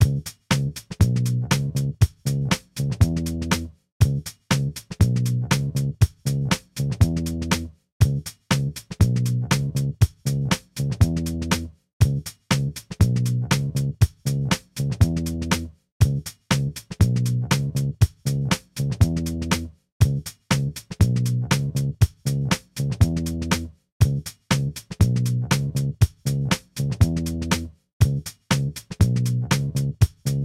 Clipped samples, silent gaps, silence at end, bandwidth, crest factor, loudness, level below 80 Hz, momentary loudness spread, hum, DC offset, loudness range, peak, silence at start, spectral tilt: under 0.1%; 3.92-4.00 s, 7.92-8.00 s, 11.93-12.00 s, 15.92-16.00 s, 19.92-20.00 s, 23.92-24.00 s, 27.93-28.00 s; 0 s; 16 kHz; 18 dB; -23 LUFS; -34 dBFS; 6 LU; none; under 0.1%; 1 LU; -4 dBFS; 0 s; -5.5 dB/octave